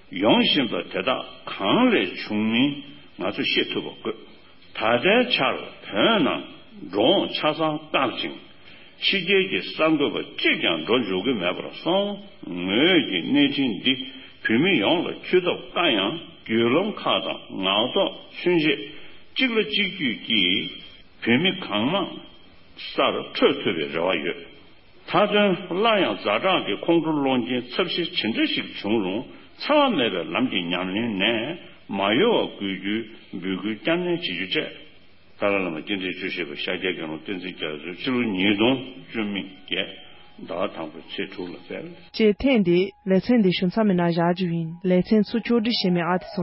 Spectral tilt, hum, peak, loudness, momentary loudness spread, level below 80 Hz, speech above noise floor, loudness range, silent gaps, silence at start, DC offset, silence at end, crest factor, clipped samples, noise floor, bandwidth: -9.5 dB/octave; none; -6 dBFS; -23 LUFS; 13 LU; -58 dBFS; 31 dB; 5 LU; none; 0.1 s; 0.3%; 0 s; 18 dB; under 0.1%; -54 dBFS; 5.8 kHz